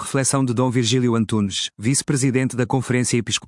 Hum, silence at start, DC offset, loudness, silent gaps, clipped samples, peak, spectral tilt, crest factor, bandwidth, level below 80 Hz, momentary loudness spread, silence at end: none; 0 s; under 0.1%; -20 LUFS; none; under 0.1%; -4 dBFS; -4.5 dB/octave; 16 dB; 12 kHz; -58 dBFS; 3 LU; 0 s